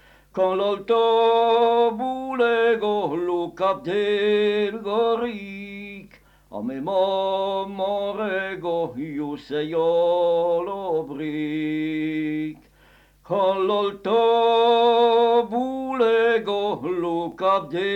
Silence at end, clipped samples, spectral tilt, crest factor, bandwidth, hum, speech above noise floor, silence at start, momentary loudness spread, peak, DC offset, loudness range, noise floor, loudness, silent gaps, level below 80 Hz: 0 s; under 0.1%; -6.5 dB/octave; 14 dB; 8.2 kHz; none; 33 dB; 0.35 s; 11 LU; -8 dBFS; under 0.1%; 6 LU; -55 dBFS; -22 LUFS; none; -60 dBFS